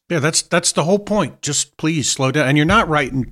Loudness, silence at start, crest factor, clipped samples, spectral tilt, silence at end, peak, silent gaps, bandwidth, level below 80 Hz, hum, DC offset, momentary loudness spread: -17 LUFS; 0.1 s; 14 dB; under 0.1%; -4 dB/octave; 0 s; -2 dBFS; none; 15.5 kHz; -40 dBFS; none; under 0.1%; 6 LU